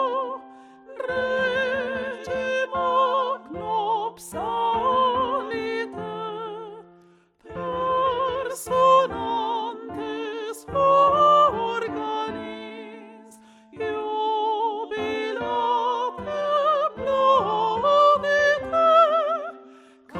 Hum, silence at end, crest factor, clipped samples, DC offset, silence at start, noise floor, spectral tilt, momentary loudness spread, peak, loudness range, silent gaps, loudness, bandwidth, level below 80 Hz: none; 0 s; 18 dB; under 0.1%; under 0.1%; 0 s; -56 dBFS; -4 dB/octave; 15 LU; -6 dBFS; 8 LU; none; -23 LUFS; 14.5 kHz; -58 dBFS